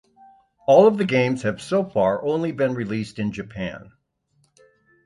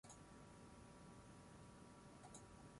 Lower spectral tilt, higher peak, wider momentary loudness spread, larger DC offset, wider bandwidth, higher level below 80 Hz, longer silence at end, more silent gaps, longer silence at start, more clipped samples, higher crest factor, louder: first, -7 dB/octave vs -4.5 dB/octave; first, -2 dBFS vs -44 dBFS; first, 16 LU vs 2 LU; neither; about the same, 11.5 kHz vs 11.5 kHz; first, -56 dBFS vs -72 dBFS; first, 1.25 s vs 0 s; neither; first, 0.7 s vs 0.05 s; neither; about the same, 20 dB vs 18 dB; first, -21 LUFS vs -62 LUFS